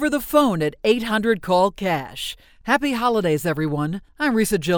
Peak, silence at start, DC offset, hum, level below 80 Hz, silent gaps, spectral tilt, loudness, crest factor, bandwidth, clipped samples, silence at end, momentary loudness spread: -2 dBFS; 0 s; under 0.1%; none; -48 dBFS; none; -5 dB/octave; -21 LUFS; 18 dB; over 20 kHz; under 0.1%; 0 s; 9 LU